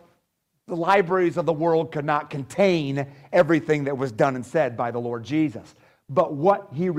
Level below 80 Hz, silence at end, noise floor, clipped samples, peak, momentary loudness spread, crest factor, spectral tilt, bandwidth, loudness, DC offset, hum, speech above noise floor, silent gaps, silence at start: -64 dBFS; 0 s; -74 dBFS; under 0.1%; -6 dBFS; 8 LU; 18 dB; -7 dB/octave; 13 kHz; -23 LUFS; under 0.1%; none; 51 dB; none; 0.7 s